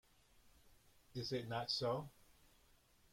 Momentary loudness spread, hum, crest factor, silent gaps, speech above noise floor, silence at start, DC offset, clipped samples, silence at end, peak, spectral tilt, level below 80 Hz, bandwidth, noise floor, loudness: 12 LU; none; 20 dB; none; 29 dB; 0.45 s; under 0.1%; under 0.1%; 0.8 s; -28 dBFS; -5 dB/octave; -72 dBFS; 16.5 kHz; -71 dBFS; -43 LUFS